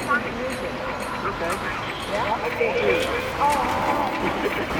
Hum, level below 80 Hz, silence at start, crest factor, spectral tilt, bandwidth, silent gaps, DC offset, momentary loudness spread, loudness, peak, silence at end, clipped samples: none; -44 dBFS; 0 s; 16 dB; -4.5 dB/octave; 19 kHz; none; under 0.1%; 7 LU; -24 LUFS; -8 dBFS; 0 s; under 0.1%